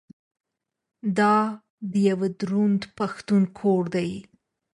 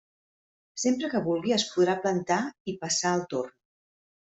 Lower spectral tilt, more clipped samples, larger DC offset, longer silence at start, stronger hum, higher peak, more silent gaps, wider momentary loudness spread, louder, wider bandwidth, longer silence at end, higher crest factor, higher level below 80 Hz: first, -7.5 dB/octave vs -4 dB/octave; neither; neither; first, 1.05 s vs 0.75 s; neither; about the same, -10 dBFS vs -12 dBFS; about the same, 1.70-1.78 s vs 2.60-2.65 s; about the same, 11 LU vs 9 LU; first, -24 LUFS vs -27 LUFS; first, 10.5 kHz vs 8.2 kHz; second, 0.5 s vs 0.9 s; about the same, 14 dB vs 18 dB; first, -64 dBFS vs -70 dBFS